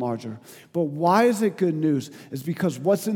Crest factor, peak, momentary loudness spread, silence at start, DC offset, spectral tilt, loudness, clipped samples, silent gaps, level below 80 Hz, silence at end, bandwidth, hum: 18 dB; -4 dBFS; 15 LU; 0 s; under 0.1%; -6.5 dB/octave; -24 LUFS; under 0.1%; none; -78 dBFS; 0 s; 19 kHz; none